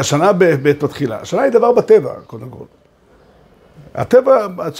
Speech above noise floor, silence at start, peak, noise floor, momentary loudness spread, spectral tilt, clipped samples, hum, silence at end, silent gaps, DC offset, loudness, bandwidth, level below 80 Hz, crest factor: 36 dB; 0 s; 0 dBFS; -50 dBFS; 20 LU; -5.5 dB/octave; under 0.1%; none; 0 s; none; under 0.1%; -13 LUFS; 15.5 kHz; -54 dBFS; 14 dB